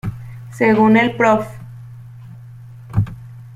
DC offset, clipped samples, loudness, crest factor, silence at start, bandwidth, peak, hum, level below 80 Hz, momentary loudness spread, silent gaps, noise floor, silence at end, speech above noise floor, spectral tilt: under 0.1%; under 0.1%; -16 LUFS; 16 dB; 0.05 s; 12.5 kHz; -2 dBFS; none; -44 dBFS; 25 LU; none; -37 dBFS; 0 s; 23 dB; -7.5 dB/octave